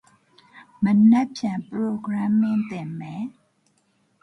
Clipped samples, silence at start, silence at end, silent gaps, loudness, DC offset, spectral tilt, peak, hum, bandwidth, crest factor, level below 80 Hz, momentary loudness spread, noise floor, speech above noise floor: under 0.1%; 0.55 s; 0.95 s; none; -22 LUFS; under 0.1%; -7.5 dB/octave; -8 dBFS; none; 6.4 kHz; 16 dB; -68 dBFS; 17 LU; -66 dBFS; 45 dB